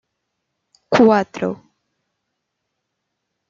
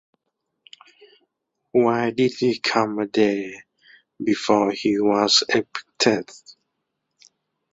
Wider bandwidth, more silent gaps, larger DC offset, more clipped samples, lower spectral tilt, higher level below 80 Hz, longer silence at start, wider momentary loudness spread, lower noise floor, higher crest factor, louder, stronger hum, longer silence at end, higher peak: about the same, 7.4 kHz vs 8 kHz; neither; neither; neither; first, -6.5 dB/octave vs -3.5 dB/octave; about the same, -62 dBFS vs -64 dBFS; second, 0.9 s vs 1.75 s; about the same, 14 LU vs 12 LU; about the same, -77 dBFS vs -78 dBFS; about the same, 20 dB vs 20 dB; first, -17 LUFS vs -21 LUFS; neither; first, 1.95 s vs 1.2 s; about the same, -2 dBFS vs -4 dBFS